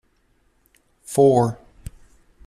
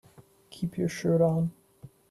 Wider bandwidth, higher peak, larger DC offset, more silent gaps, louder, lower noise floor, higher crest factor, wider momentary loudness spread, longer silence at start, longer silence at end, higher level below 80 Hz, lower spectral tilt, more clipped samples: first, 14.5 kHz vs 12.5 kHz; first, -4 dBFS vs -14 dBFS; neither; neither; first, -18 LUFS vs -28 LUFS; first, -63 dBFS vs -56 dBFS; about the same, 18 dB vs 16 dB; first, 27 LU vs 11 LU; first, 1.1 s vs 0.5 s; first, 0.95 s vs 0.25 s; first, -48 dBFS vs -62 dBFS; about the same, -7.5 dB/octave vs -7.5 dB/octave; neither